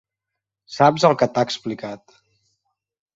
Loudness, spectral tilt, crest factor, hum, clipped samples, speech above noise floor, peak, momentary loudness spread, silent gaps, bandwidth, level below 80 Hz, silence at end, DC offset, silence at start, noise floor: -19 LUFS; -5.5 dB/octave; 20 dB; none; under 0.1%; 65 dB; -2 dBFS; 20 LU; none; 8 kHz; -64 dBFS; 1.2 s; under 0.1%; 0.7 s; -84 dBFS